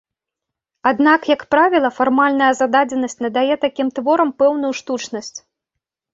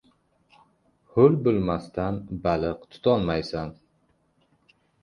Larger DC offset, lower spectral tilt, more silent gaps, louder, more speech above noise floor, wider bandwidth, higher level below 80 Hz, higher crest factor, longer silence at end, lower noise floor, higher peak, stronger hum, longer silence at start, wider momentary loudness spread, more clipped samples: neither; second, -3.5 dB/octave vs -8.5 dB/octave; neither; first, -16 LUFS vs -25 LUFS; first, 67 dB vs 44 dB; second, 8 kHz vs 10 kHz; second, -62 dBFS vs -48 dBFS; second, 16 dB vs 22 dB; second, 0.75 s vs 1.3 s; first, -83 dBFS vs -67 dBFS; first, -2 dBFS vs -6 dBFS; neither; second, 0.85 s vs 1.15 s; about the same, 10 LU vs 12 LU; neither